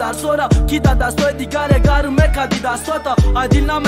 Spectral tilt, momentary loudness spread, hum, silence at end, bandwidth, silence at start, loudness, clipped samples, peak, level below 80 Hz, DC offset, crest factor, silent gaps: -6 dB/octave; 5 LU; none; 0 s; 16 kHz; 0 s; -16 LUFS; under 0.1%; 0 dBFS; -18 dBFS; under 0.1%; 14 dB; none